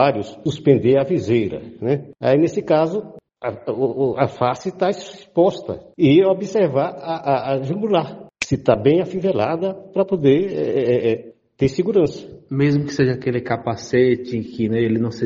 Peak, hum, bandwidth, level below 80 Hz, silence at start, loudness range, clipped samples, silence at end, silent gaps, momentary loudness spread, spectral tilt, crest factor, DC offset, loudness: 0 dBFS; none; 8 kHz; -52 dBFS; 0 s; 2 LU; under 0.1%; 0 s; none; 10 LU; -7 dB/octave; 18 dB; under 0.1%; -19 LUFS